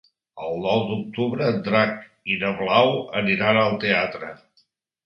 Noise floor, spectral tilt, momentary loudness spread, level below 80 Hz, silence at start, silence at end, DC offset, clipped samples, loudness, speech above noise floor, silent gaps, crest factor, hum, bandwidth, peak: -65 dBFS; -7.5 dB/octave; 12 LU; -60 dBFS; 0.35 s; 0.7 s; under 0.1%; under 0.1%; -22 LUFS; 43 dB; none; 22 dB; none; 6.4 kHz; -2 dBFS